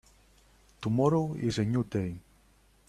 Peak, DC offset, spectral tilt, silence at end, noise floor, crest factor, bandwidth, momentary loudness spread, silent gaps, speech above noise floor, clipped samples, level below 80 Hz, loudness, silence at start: -12 dBFS; under 0.1%; -7.5 dB/octave; 0.7 s; -63 dBFS; 18 dB; 13 kHz; 12 LU; none; 35 dB; under 0.1%; -58 dBFS; -30 LUFS; 0.8 s